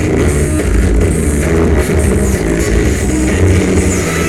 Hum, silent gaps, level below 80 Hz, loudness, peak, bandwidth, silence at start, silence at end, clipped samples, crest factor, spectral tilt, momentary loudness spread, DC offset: none; none; -16 dBFS; -12 LUFS; 0 dBFS; 14.5 kHz; 0 s; 0 s; under 0.1%; 12 dB; -6 dB/octave; 2 LU; 2%